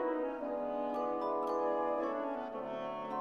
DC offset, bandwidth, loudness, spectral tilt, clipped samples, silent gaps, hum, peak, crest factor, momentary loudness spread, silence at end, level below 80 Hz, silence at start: under 0.1%; 7 kHz; -37 LUFS; -6.5 dB/octave; under 0.1%; none; none; -24 dBFS; 12 dB; 6 LU; 0 s; -72 dBFS; 0 s